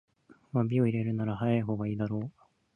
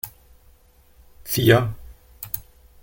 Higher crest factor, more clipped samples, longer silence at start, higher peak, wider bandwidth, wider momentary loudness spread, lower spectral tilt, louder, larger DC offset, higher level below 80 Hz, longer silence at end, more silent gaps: second, 16 dB vs 24 dB; neither; first, 0.55 s vs 0.05 s; second, -14 dBFS vs -2 dBFS; second, 3.6 kHz vs 17 kHz; second, 7 LU vs 24 LU; first, -10 dB/octave vs -5.5 dB/octave; second, -31 LUFS vs -21 LUFS; neither; second, -62 dBFS vs -48 dBFS; about the same, 0.45 s vs 0.4 s; neither